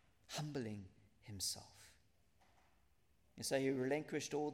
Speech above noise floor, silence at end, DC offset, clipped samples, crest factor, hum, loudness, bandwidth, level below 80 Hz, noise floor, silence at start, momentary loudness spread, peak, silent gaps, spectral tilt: 35 dB; 0 s; under 0.1%; under 0.1%; 20 dB; none; -43 LUFS; 16 kHz; -78 dBFS; -77 dBFS; 0.3 s; 23 LU; -26 dBFS; none; -4 dB/octave